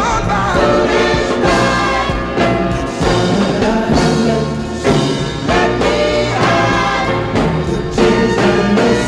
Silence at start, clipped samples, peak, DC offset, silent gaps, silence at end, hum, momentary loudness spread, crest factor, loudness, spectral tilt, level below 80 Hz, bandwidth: 0 s; under 0.1%; 0 dBFS; under 0.1%; none; 0 s; none; 5 LU; 14 dB; -14 LUFS; -5.5 dB/octave; -28 dBFS; 12.5 kHz